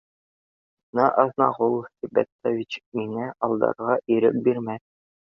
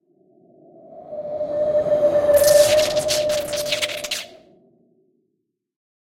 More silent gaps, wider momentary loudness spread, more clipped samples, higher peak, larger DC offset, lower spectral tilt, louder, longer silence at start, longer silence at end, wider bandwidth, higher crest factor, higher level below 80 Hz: first, 2.32-2.39 s, 2.86-2.92 s vs none; second, 10 LU vs 16 LU; neither; about the same, -4 dBFS vs -4 dBFS; neither; first, -8 dB/octave vs -2 dB/octave; second, -24 LUFS vs -19 LUFS; about the same, 0.95 s vs 0.9 s; second, 0.45 s vs 1.85 s; second, 7 kHz vs 17 kHz; about the same, 22 dB vs 18 dB; second, -68 dBFS vs -54 dBFS